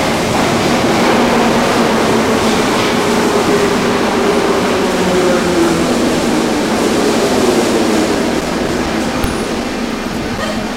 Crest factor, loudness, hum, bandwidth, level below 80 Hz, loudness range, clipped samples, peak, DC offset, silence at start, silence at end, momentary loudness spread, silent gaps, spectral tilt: 12 dB; -13 LUFS; none; 16 kHz; -34 dBFS; 2 LU; under 0.1%; 0 dBFS; under 0.1%; 0 s; 0 s; 6 LU; none; -4.5 dB/octave